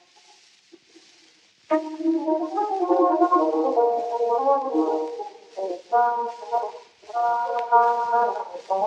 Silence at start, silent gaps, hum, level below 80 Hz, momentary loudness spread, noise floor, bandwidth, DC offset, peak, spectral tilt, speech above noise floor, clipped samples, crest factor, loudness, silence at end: 1.7 s; none; none; -90 dBFS; 13 LU; -57 dBFS; 8.6 kHz; under 0.1%; -6 dBFS; -4.5 dB/octave; 35 dB; under 0.1%; 18 dB; -23 LUFS; 0 s